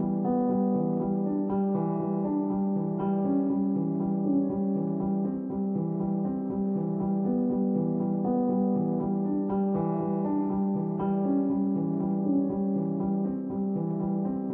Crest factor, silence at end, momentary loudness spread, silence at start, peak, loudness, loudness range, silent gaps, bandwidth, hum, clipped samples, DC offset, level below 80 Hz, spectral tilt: 12 dB; 0 s; 3 LU; 0 s; -16 dBFS; -28 LUFS; 1 LU; none; 2.1 kHz; none; under 0.1%; under 0.1%; -60 dBFS; -14 dB/octave